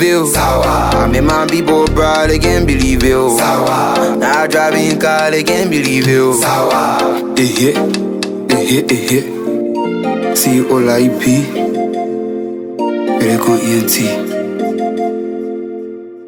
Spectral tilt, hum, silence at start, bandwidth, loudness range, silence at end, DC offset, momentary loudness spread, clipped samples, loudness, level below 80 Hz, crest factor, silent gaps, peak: -4.5 dB/octave; none; 0 s; over 20 kHz; 3 LU; 0 s; under 0.1%; 7 LU; under 0.1%; -13 LUFS; -28 dBFS; 12 dB; none; 0 dBFS